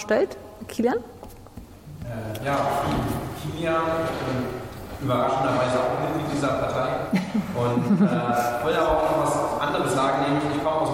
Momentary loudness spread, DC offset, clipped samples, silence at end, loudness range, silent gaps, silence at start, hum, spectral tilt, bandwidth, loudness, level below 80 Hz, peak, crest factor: 14 LU; under 0.1%; under 0.1%; 0 s; 5 LU; none; 0 s; none; -6 dB/octave; 16.5 kHz; -24 LUFS; -46 dBFS; -10 dBFS; 14 dB